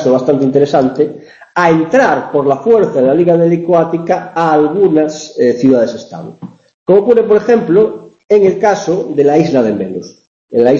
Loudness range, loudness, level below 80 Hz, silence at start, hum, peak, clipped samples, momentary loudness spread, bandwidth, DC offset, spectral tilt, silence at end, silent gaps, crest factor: 2 LU; -11 LUFS; -52 dBFS; 0 s; none; 0 dBFS; under 0.1%; 9 LU; 7.4 kHz; under 0.1%; -7 dB/octave; 0 s; 6.74-6.86 s, 8.25-8.29 s, 10.27-10.48 s; 10 dB